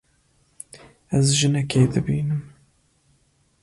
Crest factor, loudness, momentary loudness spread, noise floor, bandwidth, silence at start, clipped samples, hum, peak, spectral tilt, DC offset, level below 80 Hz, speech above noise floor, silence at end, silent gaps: 18 dB; -21 LUFS; 23 LU; -63 dBFS; 11.5 kHz; 0.75 s; under 0.1%; none; -6 dBFS; -5 dB/octave; under 0.1%; -50 dBFS; 42 dB; 1.15 s; none